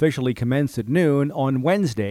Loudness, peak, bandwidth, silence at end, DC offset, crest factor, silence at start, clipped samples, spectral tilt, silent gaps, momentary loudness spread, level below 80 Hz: -21 LUFS; -6 dBFS; 15.5 kHz; 0 s; under 0.1%; 14 dB; 0 s; under 0.1%; -7.5 dB/octave; none; 3 LU; -54 dBFS